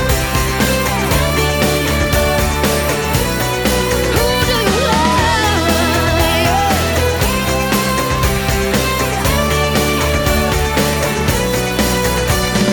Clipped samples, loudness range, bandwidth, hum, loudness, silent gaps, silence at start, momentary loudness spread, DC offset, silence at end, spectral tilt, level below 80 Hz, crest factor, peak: under 0.1%; 1 LU; over 20 kHz; none; -14 LUFS; none; 0 s; 2 LU; under 0.1%; 0 s; -4 dB/octave; -24 dBFS; 14 dB; -2 dBFS